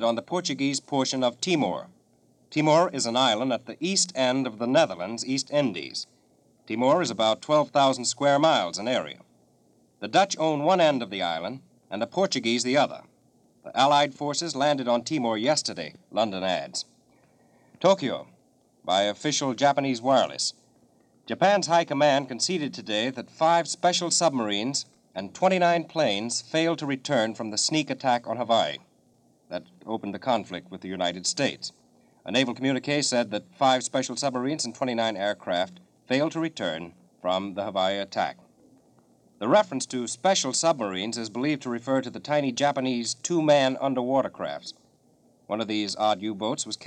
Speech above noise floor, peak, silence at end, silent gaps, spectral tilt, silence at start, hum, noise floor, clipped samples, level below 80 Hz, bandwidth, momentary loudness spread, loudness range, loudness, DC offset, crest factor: 38 dB; -8 dBFS; 0 s; none; -3.5 dB/octave; 0 s; none; -63 dBFS; under 0.1%; -76 dBFS; 10.5 kHz; 12 LU; 4 LU; -25 LUFS; under 0.1%; 18 dB